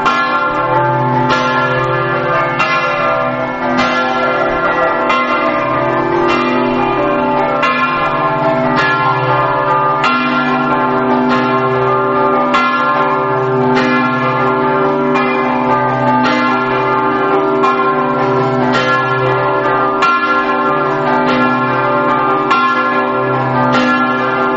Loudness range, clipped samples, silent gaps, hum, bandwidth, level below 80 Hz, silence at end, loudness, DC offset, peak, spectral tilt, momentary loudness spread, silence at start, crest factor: 1 LU; under 0.1%; none; none; 8 kHz; -44 dBFS; 0 s; -13 LUFS; under 0.1%; 0 dBFS; -4 dB/octave; 2 LU; 0 s; 12 dB